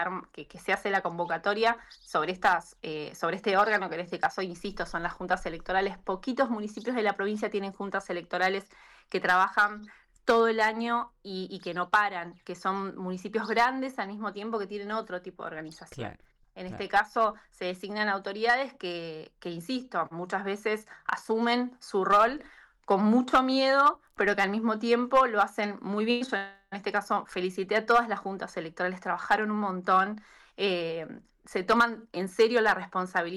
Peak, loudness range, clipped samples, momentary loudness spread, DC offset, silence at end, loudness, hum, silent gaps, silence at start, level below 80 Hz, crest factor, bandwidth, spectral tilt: -14 dBFS; 7 LU; under 0.1%; 14 LU; under 0.1%; 0 s; -28 LUFS; none; none; 0 s; -60 dBFS; 16 dB; 14.5 kHz; -5 dB/octave